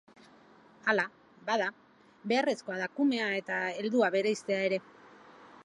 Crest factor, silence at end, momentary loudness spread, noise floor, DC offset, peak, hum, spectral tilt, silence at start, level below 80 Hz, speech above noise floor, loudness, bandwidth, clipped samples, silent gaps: 20 dB; 0 s; 8 LU; -59 dBFS; under 0.1%; -12 dBFS; none; -4.5 dB/octave; 0.85 s; -84 dBFS; 28 dB; -31 LUFS; 11.5 kHz; under 0.1%; none